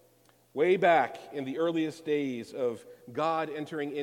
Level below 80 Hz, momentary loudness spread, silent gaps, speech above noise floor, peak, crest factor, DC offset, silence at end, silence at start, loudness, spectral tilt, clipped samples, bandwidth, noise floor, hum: -80 dBFS; 13 LU; none; 34 dB; -10 dBFS; 20 dB; under 0.1%; 0 s; 0.55 s; -30 LUFS; -6 dB/octave; under 0.1%; 16 kHz; -64 dBFS; none